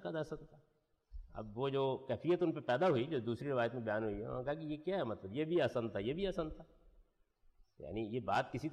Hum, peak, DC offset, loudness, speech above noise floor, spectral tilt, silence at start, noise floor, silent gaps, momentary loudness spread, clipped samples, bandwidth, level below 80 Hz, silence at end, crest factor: none; -24 dBFS; under 0.1%; -38 LUFS; 33 dB; -7.5 dB/octave; 0 s; -71 dBFS; none; 12 LU; under 0.1%; 9.8 kHz; -60 dBFS; 0 s; 14 dB